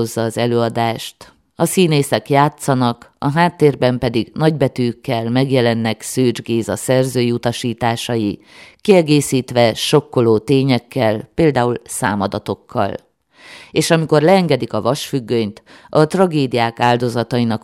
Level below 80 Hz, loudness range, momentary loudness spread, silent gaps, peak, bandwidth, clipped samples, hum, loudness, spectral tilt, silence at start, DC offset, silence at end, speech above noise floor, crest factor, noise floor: -50 dBFS; 2 LU; 7 LU; none; 0 dBFS; 16.5 kHz; under 0.1%; none; -16 LUFS; -5.5 dB/octave; 0 s; under 0.1%; 0.05 s; 27 dB; 16 dB; -43 dBFS